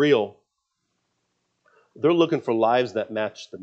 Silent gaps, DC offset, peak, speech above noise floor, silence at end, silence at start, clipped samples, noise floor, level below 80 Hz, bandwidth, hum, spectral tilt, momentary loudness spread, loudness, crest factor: none; under 0.1%; -6 dBFS; 56 dB; 0 s; 0 s; under 0.1%; -77 dBFS; -78 dBFS; 7.8 kHz; 60 Hz at -65 dBFS; -6.5 dB/octave; 9 LU; -23 LUFS; 18 dB